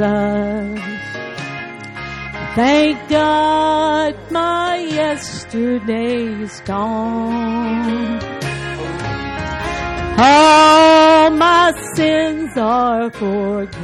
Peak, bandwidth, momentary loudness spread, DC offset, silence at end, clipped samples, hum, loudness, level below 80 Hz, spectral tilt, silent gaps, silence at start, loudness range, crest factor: -2 dBFS; 12 kHz; 17 LU; under 0.1%; 0 s; under 0.1%; none; -15 LUFS; -40 dBFS; -4.5 dB/octave; none; 0 s; 10 LU; 12 dB